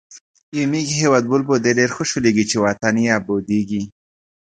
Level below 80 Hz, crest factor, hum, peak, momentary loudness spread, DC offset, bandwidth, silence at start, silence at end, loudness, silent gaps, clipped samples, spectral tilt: -54 dBFS; 18 dB; none; 0 dBFS; 8 LU; under 0.1%; 9.4 kHz; 0.1 s; 0.7 s; -18 LUFS; 0.21-0.34 s, 0.43-0.52 s; under 0.1%; -4.5 dB/octave